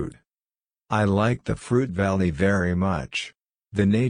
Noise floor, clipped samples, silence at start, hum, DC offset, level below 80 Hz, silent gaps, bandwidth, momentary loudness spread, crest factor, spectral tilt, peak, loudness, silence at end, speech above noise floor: under -90 dBFS; under 0.1%; 0 s; none; under 0.1%; -46 dBFS; none; 10.5 kHz; 9 LU; 18 dB; -7 dB/octave; -6 dBFS; -24 LUFS; 0 s; over 68 dB